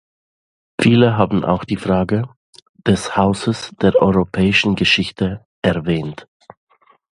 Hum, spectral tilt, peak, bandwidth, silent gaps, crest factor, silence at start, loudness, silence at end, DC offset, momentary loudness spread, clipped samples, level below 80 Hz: none; -6 dB/octave; 0 dBFS; 11.5 kHz; 2.37-2.53 s, 2.62-2.74 s, 5.45-5.62 s; 18 dB; 0.8 s; -17 LUFS; 0.9 s; under 0.1%; 10 LU; under 0.1%; -42 dBFS